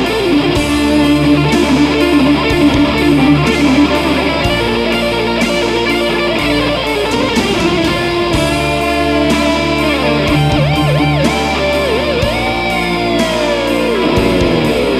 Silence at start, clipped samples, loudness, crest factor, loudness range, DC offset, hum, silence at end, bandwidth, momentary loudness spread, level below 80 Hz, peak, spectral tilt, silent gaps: 0 s; under 0.1%; -12 LUFS; 12 dB; 3 LU; under 0.1%; none; 0 s; 15 kHz; 3 LU; -28 dBFS; 0 dBFS; -5.5 dB/octave; none